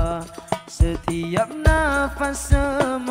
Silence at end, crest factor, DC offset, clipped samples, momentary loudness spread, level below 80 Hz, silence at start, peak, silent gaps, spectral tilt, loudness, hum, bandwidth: 0 s; 18 dB; under 0.1%; under 0.1%; 10 LU; -26 dBFS; 0 s; -2 dBFS; none; -5.5 dB/octave; -22 LUFS; none; 16 kHz